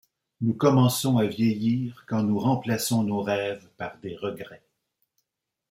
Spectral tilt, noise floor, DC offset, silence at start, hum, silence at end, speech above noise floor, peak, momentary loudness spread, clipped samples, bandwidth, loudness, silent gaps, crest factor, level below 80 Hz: -6 dB/octave; -84 dBFS; under 0.1%; 0.4 s; none; 1.15 s; 59 dB; -8 dBFS; 14 LU; under 0.1%; 16.5 kHz; -25 LUFS; none; 18 dB; -66 dBFS